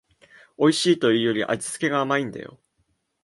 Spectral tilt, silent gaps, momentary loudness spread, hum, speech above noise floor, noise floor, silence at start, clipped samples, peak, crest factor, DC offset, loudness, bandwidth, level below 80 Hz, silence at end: -4.5 dB/octave; none; 13 LU; none; 49 dB; -71 dBFS; 0.6 s; under 0.1%; -6 dBFS; 18 dB; under 0.1%; -22 LUFS; 11.5 kHz; -68 dBFS; 0.75 s